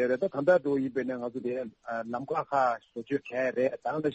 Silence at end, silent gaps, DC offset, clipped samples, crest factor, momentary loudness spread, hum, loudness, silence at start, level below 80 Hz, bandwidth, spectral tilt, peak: 0 s; none; under 0.1%; under 0.1%; 18 dB; 10 LU; none; -30 LUFS; 0 s; -72 dBFS; 7.8 kHz; -7.5 dB/octave; -12 dBFS